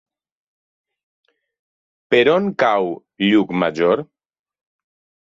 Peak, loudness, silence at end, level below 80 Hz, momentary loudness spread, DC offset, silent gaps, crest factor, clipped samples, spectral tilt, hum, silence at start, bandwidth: -2 dBFS; -17 LUFS; 1.25 s; -64 dBFS; 7 LU; under 0.1%; none; 18 dB; under 0.1%; -6.5 dB/octave; none; 2.1 s; 7.6 kHz